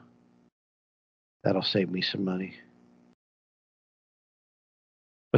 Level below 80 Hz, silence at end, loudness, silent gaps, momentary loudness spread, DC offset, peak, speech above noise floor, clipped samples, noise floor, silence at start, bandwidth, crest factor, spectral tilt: -80 dBFS; 0 s; -29 LUFS; 3.14-5.31 s; 8 LU; under 0.1%; -8 dBFS; 32 dB; under 0.1%; -61 dBFS; 1.45 s; 7 kHz; 26 dB; -7.5 dB/octave